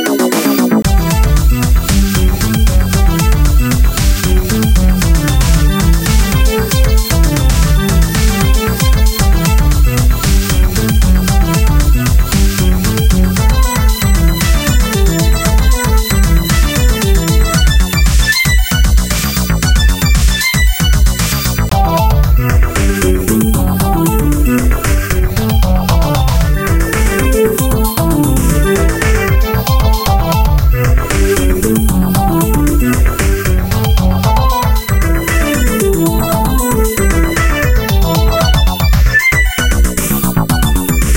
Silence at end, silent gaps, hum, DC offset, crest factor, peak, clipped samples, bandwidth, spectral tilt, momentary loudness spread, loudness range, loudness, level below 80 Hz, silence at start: 0 s; none; none; under 0.1%; 10 dB; 0 dBFS; under 0.1%; 17.5 kHz; -5 dB/octave; 2 LU; 1 LU; -12 LUFS; -12 dBFS; 0 s